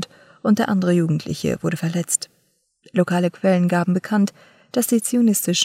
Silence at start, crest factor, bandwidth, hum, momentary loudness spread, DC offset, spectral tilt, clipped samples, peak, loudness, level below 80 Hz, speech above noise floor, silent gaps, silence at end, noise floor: 0 s; 18 dB; 16 kHz; none; 7 LU; under 0.1%; -5 dB/octave; under 0.1%; -2 dBFS; -20 LUFS; -60 dBFS; 46 dB; none; 0 s; -65 dBFS